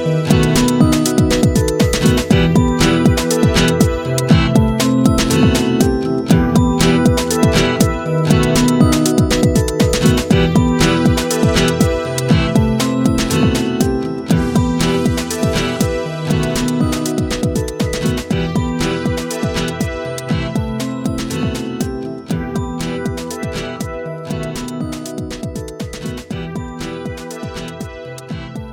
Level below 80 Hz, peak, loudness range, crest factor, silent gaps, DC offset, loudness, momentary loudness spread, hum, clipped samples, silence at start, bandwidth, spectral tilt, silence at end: -28 dBFS; 0 dBFS; 11 LU; 16 dB; none; under 0.1%; -15 LUFS; 13 LU; none; under 0.1%; 0 s; 19.5 kHz; -5.5 dB/octave; 0 s